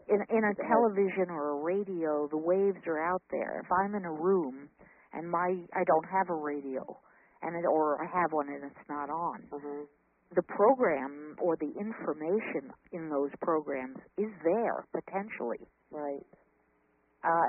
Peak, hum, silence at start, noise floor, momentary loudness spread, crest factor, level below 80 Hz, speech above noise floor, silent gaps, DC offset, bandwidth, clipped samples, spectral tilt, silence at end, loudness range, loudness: -12 dBFS; none; 0.1 s; -71 dBFS; 14 LU; 20 dB; -74 dBFS; 39 dB; none; under 0.1%; 3.1 kHz; under 0.1%; -1.5 dB/octave; 0 s; 4 LU; -32 LUFS